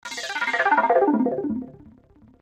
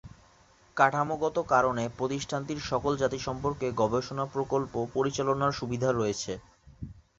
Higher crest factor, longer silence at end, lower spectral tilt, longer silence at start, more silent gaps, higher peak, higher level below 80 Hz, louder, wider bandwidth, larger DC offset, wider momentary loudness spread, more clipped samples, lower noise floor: second, 14 dB vs 22 dB; first, 0.5 s vs 0.2 s; second, -4 dB/octave vs -5.5 dB/octave; about the same, 0.05 s vs 0.05 s; neither; about the same, -8 dBFS vs -6 dBFS; second, -62 dBFS vs -54 dBFS; first, -22 LUFS vs -29 LUFS; first, 15 kHz vs 8 kHz; neither; first, 12 LU vs 9 LU; neither; second, -53 dBFS vs -60 dBFS